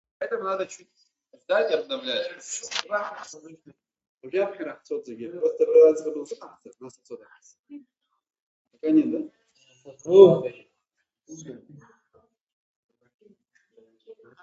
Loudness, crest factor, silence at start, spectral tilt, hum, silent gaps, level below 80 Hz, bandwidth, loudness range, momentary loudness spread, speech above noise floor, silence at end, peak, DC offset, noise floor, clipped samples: -23 LUFS; 24 dB; 0.2 s; -5 dB/octave; none; 4.09-4.18 s, 7.59-7.64 s, 8.42-8.65 s, 12.41-12.47 s, 12.53-12.89 s, 13.14-13.19 s; -76 dBFS; 8.2 kHz; 9 LU; 26 LU; 56 dB; 0.3 s; -2 dBFS; under 0.1%; -79 dBFS; under 0.1%